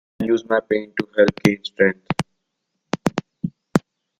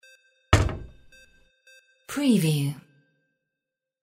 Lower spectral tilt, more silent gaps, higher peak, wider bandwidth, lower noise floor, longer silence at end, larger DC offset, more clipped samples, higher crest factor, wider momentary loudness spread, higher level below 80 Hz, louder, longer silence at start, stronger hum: about the same, -6 dB/octave vs -5.5 dB/octave; neither; about the same, 0 dBFS vs -2 dBFS; about the same, 15 kHz vs 16 kHz; second, -76 dBFS vs -87 dBFS; second, 0.4 s vs 1.2 s; neither; neither; about the same, 22 dB vs 26 dB; second, 12 LU vs 16 LU; second, -54 dBFS vs -40 dBFS; first, -22 LUFS vs -25 LUFS; second, 0.2 s vs 0.5 s; neither